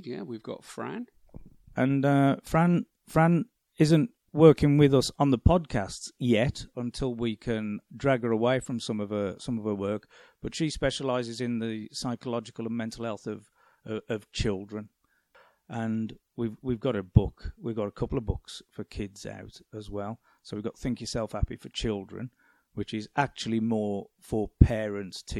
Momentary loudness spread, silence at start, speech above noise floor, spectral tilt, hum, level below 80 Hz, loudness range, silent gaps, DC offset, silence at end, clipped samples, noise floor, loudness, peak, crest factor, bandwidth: 16 LU; 0 s; 35 dB; -6.5 dB/octave; none; -42 dBFS; 12 LU; none; under 0.1%; 0 s; under 0.1%; -63 dBFS; -28 LUFS; -4 dBFS; 26 dB; 13.5 kHz